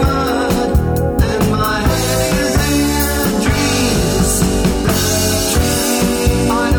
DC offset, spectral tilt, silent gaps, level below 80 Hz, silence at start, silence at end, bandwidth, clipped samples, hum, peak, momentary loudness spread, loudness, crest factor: under 0.1%; -4.5 dB/octave; none; -22 dBFS; 0 s; 0 s; over 20 kHz; under 0.1%; none; -2 dBFS; 2 LU; -14 LUFS; 12 dB